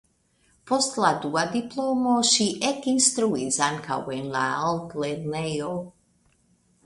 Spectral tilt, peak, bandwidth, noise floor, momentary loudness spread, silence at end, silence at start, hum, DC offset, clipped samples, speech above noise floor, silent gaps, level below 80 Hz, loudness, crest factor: -3 dB/octave; -4 dBFS; 11.5 kHz; -65 dBFS; 10 LU; 0.95 s; 0.65 s; none; under 0.1%; under 0.1%; 40 dB; none; -62 dBFS; -24 LUFS; 22 dB